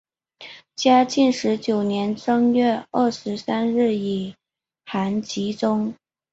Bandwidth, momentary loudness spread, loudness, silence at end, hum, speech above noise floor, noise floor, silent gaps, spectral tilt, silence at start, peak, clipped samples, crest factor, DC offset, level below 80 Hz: 8 kHz; 12 LU; -21 LUFS; 0.4 s; none; 33 dB; -53 dBFS; none; -5.5 dB/octave; 0.4 s; -4 dBFS; under 0.1%; 18 dB; under 0.1%; -64 dBFS